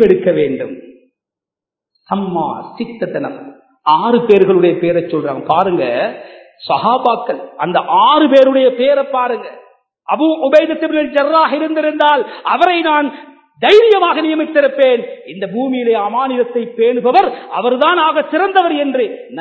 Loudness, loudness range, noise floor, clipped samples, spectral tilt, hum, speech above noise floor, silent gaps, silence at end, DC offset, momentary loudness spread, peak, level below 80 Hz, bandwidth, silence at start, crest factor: -13 LUFS; 4 LU; -86 dBFS; 0.2%; -7 dB/octave; none; 73 dB; none; 0 s; under 0.1%; 13 LU; 0 dBFS; -58 dBFS; 8 kHz; 0 s; 14 dB